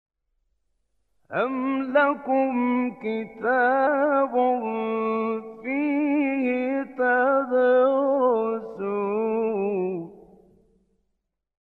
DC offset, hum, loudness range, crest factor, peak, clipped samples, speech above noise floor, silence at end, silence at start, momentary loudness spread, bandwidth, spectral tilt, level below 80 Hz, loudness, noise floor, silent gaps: under 0.1%; none; 4 LU; 16 dB; -8 dBFS; under 0.1%; 56 dB; 1.5 s; 1.3 s; 9 LU; 4.3 kHz; -8.5 dB/octave; -72 dBFS; -24 LUFS; -78 dBFS; none